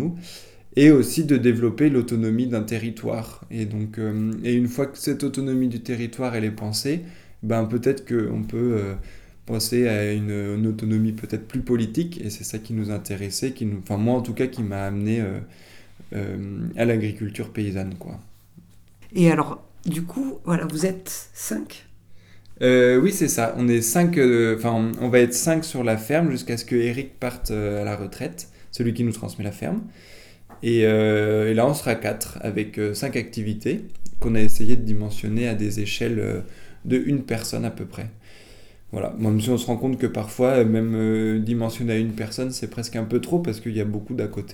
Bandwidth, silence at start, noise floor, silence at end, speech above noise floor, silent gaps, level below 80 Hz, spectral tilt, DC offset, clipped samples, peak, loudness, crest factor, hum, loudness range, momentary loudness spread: 19 kHz; 0 s; -49 dBFS; 0 s; 28 dB; none; -46 dBFS; -6 dB/octave; under 0.1%; under 0.1%; -2 dBFS; -23 LUFS; 20 dB; none; 7 LU; 12 LU